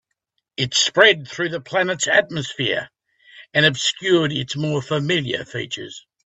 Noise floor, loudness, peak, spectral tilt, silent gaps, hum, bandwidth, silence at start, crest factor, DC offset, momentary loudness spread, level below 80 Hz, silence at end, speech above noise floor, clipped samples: -76 dBFS; -19 LUFS; 0 dBFS; -3.5 dB/octave; none; none; 8.4 kHz; 0.6 s; 20 dB; under 0.1%; 13 LU; -60 dBFS; 0.25 s; 55 dB; under 0.1%